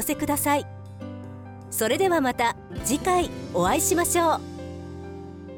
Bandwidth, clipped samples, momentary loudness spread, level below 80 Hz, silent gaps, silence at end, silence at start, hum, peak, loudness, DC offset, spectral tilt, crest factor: 19 kHz; under 0.1%; 18 LU; -48 dBFS; none; 0 s; 0 s; none; -10 dBFS; -24 LUFS; under 0.1%; -3.5 dB/octave; 14 dB